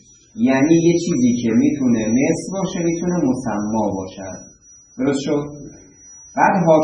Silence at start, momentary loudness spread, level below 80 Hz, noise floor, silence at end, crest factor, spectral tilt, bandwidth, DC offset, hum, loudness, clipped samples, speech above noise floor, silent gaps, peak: 0.35 s; 17 LU; -50 dBFS; -43 dBFS; 0 s; 18 dB; -6 dB/octave; 10 kHz; under 0.1%; none; -18 LUFS; under 0.1%; 26 dB; none; 0 dBFS